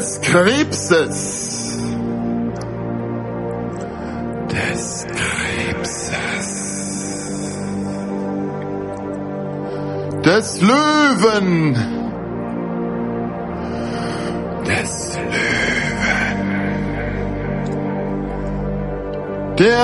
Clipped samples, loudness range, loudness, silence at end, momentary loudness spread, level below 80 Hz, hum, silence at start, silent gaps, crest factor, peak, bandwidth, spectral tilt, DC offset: under 0.1%; 7 LU; -20 LUFS; 0 s; 11 LU; -38 dBFS; none; 0 s; none; 20 dB; 0 dBFS; 11.5 kHz; -4.5 dB/octave; under 0.1%